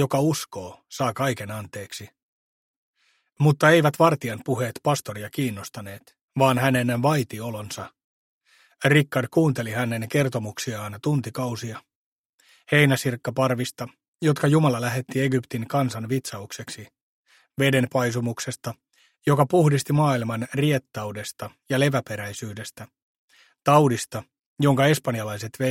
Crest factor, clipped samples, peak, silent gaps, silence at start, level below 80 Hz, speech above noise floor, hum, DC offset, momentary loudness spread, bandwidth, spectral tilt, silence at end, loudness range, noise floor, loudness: 22 dB; under 0.1%; -2 dBFS; 2.23-2.93 s, 6.21-6.28 s, 8.04-8.41 s, 11.95-12.39 s, 14.08-14.13 s, 17.02-17.24 s, 23.02-23.28 s, 24.46-24.56 s; 0 s; -62 dBFS; 38 dB; none; under 0.1%; 17 LU; 16.5 kHz; -5.5 dB/octave; 0 s; 4 LU; -61 dBFS; -23 LUFS